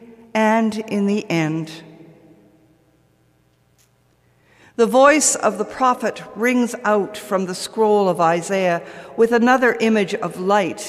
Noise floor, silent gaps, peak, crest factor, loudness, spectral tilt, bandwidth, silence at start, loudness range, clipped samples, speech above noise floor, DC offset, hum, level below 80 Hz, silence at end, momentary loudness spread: -59 dBFS; none; 0 dBFS; 18 dB; -18 LUFS; -4 dB/octave; 15 kHz; 0 s; 9 LU; under 0.1%; 41 dB; under 0.1%; none; -64 dBFS; 0 s; 11 LU